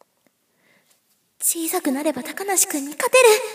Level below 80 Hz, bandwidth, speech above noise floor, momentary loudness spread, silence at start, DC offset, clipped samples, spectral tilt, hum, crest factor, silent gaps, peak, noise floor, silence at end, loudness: -80 dBFS; 16 kHz; 46 dB; 10 LU; 1.4 s; under 0.1%; under 0.1%; -0.5 dB/octave; none; 20 dB; none; -2 dBFS; -65 dBFS; 0 s; -19 LUFS